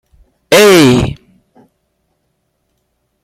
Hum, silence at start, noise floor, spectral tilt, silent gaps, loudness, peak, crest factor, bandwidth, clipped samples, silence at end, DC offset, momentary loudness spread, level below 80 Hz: none; 0.5 s; -65 dBFS; -4.5 dB/octave; none; -8 LUFS; 0 dBFS; 14 dB; 16.5 kHz; under 0.1%; 2.1 s; under 0.1%; 17 LU; -38 dBFS